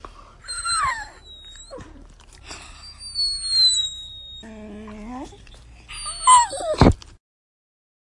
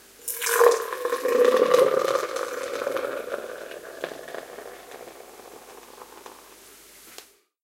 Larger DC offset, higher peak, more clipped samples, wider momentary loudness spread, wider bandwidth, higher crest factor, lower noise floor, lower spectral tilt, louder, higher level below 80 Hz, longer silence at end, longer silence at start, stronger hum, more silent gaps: neither; about the same, 0 dBFS vs -2 dBFS; neither; about the same, 25 LU vs 25 LU; second, 11.5 kHz vs 17 kHz; about the same, 24 dB vs 24 dB; second, -45 dBFS vs -50 dBFS; first, -3 dB/octave vs -1.5 dB/octave; first, -19 LUFS vs -24 LUFS; first, -38 dBFS vs -70 dBFS; first, 1.15 s vs 0.4 s; second, 0.05 s vs 0.2 s; neither; neither